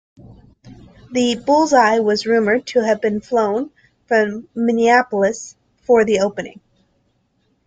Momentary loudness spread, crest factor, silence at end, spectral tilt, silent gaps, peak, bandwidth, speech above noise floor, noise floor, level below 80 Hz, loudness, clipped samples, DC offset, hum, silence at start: 14 LU; 16 dB; 1.15 s; -4.5 dB/octave; none; -2 dBFS; 9.2 kHz; 48 dB; -64 dBFS; -56 dBFS; -17 LUFS; under 0.1%; under 0.1%; none; 0.65 s